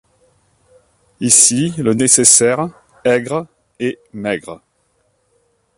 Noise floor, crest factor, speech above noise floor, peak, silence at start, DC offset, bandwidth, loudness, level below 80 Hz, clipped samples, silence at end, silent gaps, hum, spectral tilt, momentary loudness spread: -62 dBFS; 18 dB; 48 dB; 0 dBFS; 1.2 s; under 0.1%; 16 kHz; -13 LUFS; -56 dBFS; under 0.1%; 1.2 s; none; none; -3 dB/octave; 16 LU